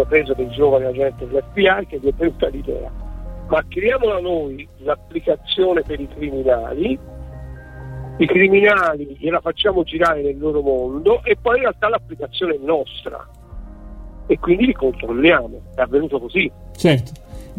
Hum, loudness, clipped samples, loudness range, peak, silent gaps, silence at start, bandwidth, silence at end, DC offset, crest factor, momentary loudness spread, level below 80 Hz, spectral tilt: none; -18 LUFS; under 0.1%; 5 LU; -2 dBFS; none; 0 s; 13.5 kHz; 0 s; 0.1%; 18 dB; 19 LU; -36 dBFS; -6.5 dB/octave